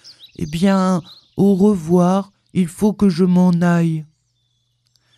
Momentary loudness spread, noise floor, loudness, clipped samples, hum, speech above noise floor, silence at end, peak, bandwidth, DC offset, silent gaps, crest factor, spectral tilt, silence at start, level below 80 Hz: 11 LU; -66 dBFS; -17 LUFS; under 0.1%; none; 51 dB; 1.15 s; -4 dBFS; 12.5 kHz; under 0.1%; none; 14 dB; -7.5 dB/octave; 0.05 s; -48 dBFS